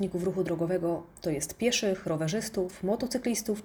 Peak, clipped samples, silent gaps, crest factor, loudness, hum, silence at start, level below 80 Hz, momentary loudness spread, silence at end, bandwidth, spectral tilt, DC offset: -14 dBFS; under 0.1%; none; 16 dB; -30 LUFS; none; 0 s; -58 dBFS; 5 LU; 0 s; over 20 kHz; -4.5 dB/octave; under 0.1%